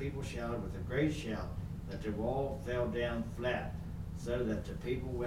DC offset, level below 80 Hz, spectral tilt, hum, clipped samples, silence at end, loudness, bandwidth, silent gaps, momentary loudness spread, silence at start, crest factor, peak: under 0.1%; -46 dBFS; -7 dB/octave; none; under 0.1%; 0 s; -38 LUFS; 16.5 kHz; none; 8 LU; 0 s; 16 dB; -22 dBFS